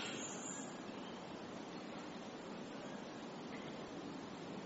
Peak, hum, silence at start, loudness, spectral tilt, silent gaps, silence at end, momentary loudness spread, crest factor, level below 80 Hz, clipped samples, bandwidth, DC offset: -34 dBFS; none; 0 s; -48 LUFS; -3.5 dB/octave; none; 0 s; 5 LU; 14 dB; -78 dBFS; under 0.1%; 8 kHz; under 0.1%